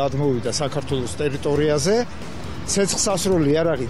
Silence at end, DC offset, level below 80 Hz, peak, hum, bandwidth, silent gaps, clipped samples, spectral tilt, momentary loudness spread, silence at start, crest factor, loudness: 0 s; 2%; -42 dBFS; -8 dBFS; none; 13.5 kHz; none; under 0.1%; -4.5 dB/octave; 10 LU; 0 s; 12 dB; -21 LUFS